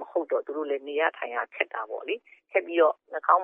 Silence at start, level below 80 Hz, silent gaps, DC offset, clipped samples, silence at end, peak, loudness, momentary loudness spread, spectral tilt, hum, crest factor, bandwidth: 0 s; under -90 dBFS; none; under 0.1%; under 0.1%; 0 s; -6 dBFS; -28 LUFS; 10 LU; -5 dB/octave; none; 22 dB; 3.7 kHz